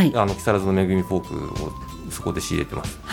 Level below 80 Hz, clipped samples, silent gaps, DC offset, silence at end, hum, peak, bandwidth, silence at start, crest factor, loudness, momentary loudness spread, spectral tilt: -40 dBFS; under 0.1%; none; under 0.1%; 0 s; none; -4 dBFS; 17.5 kHz; 0 s; 18 dB; -24 LUFS; 11 LU; -6 dB/octave